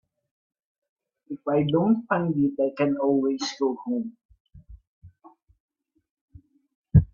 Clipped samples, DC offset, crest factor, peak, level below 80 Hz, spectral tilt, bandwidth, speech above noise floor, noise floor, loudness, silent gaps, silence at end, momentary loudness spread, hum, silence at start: under 0.1%; under 0.1%; 22 dB; -4 dBFS; -44 dBFS; -7.5 dB/octave; 7.4 kHz; 32 dB; -56 dBFS; -25 LUFS; 4.25-4.29 s, 4.40-4.45 s, 4.87-5.02 s, 5.60-5.68 s, 6.11-6.28 s, 6.75-6.82 s; 0.05 s; 9 LU; none; 1.3 s